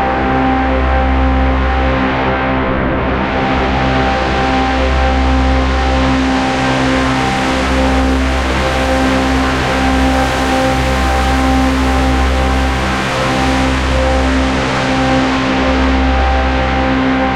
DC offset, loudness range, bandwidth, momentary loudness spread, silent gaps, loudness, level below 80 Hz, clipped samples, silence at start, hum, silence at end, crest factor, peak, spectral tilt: under 0.1%; 1 LU; 12.5 kHz; 2 LU; none; -13 LUFS; -18 dBFS; under 0.1%; 0 s; none; 0 s; 12 dB; 0 dBFS; -5.5 dB/octave